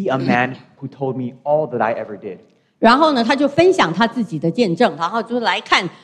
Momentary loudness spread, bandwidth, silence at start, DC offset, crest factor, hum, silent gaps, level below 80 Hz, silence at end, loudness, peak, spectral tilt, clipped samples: 12 LU; 10 kHz; 0 s; under 0.1%; 18 dB; none; none; -58 dBFS; 0.1 s; -17 LUFS; 0 dBFS; -5.5 dB/octave; under 0.1%